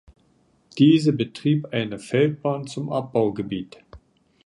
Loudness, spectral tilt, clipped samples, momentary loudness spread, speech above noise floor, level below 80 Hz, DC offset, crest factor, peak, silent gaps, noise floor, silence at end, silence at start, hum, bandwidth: -22 LUFS; -7 dB/octave; under 0.1%; 13 LU; 40 dB; -58 dBFS; under 0.1%; 18 dB; -6 dBFS; none; -62 dBFS; 0.5 s; 0.75 s; none; 11.5 kHz